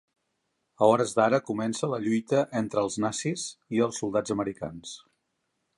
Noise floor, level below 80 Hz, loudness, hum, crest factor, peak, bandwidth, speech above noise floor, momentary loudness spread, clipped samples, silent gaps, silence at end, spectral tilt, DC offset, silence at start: -78 dBFS; -66 dBFS; -27 LUFS; none; 22 dB; -6 dBFS; 11.5 kHz; 51 dB; 13 LU; under 0.1%; none; 0.8 s; -5 dB/octave; under 0.1%; 0.8 s